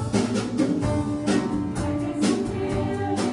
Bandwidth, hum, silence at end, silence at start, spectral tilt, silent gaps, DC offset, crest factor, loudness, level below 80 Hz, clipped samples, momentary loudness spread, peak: 11 kHz; none; 0 s; 0 s; -6 dB/octave; none; under 0.1%; 16 dB; -25 LUFS; -44 dBFS; under 0.1%; 3 LU; -8 dBFS